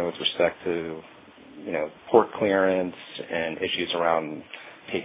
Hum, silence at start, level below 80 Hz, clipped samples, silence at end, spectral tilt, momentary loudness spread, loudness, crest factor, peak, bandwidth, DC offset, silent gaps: none; 0 s; -62 dBFS; under 0.1%; 0 s; -8.5 dB/octave; 17 LU; -25 LUFS; 24 dB; -2 dBFS; 4 kHz; under 0.1%; none